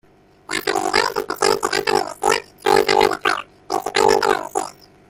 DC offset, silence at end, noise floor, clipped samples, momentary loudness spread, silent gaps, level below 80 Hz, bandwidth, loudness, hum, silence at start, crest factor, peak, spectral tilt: under 0.1%; 0.4 s; -39 dBFS; under 0.1%; 11 LU; none; -52 dBFS; 17 kHz; -19 LUFS; none; 0.5 s; 18 dB; -2 dBFS; -2 dB/octave